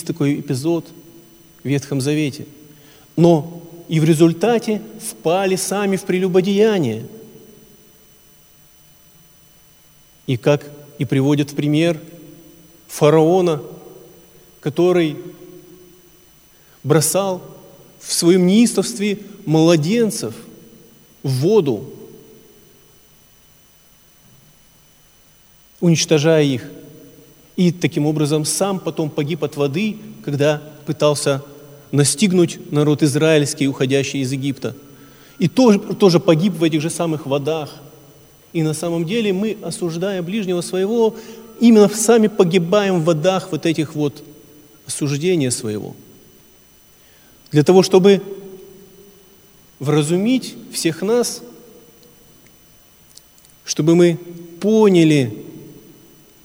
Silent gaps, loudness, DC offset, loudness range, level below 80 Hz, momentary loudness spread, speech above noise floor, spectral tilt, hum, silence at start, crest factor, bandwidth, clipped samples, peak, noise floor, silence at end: none; -17 LUFS; under 0.1%; 7 LU; -60 dBFS; 15 LU; 35 dB; -5.5 dB/octave; none; 0 s; 18 dB; over 20 kHz; under 0.1%; 0 dBFS; -51 dBFS; 0.7 s